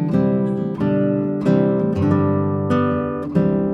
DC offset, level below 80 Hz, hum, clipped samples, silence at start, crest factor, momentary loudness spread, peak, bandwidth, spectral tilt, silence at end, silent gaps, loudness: under 0.1%; -52 dBFS; none; under 0.1%; 0 s; 14 dB; 4 LU; -4 dBFS; 7.2 kHz; -10 dB/octave; 0 s; none; -19 LUFS